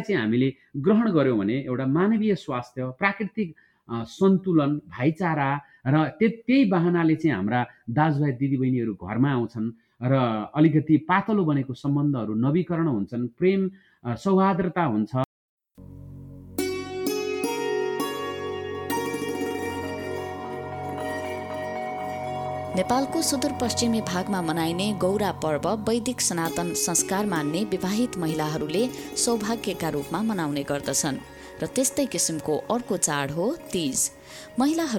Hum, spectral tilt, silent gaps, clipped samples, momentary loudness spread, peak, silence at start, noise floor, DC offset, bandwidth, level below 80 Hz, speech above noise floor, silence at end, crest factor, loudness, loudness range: none; -5 dB/octave; 15.25-15.57 s; under 0.1%; 10 LU; -6 dBFS; 0 s; -44 dBFS; under 0.1%; 19 kHz; -58 dBFS; 20 dB; 0 s; 18 dB; -25 LUFS; 6 LU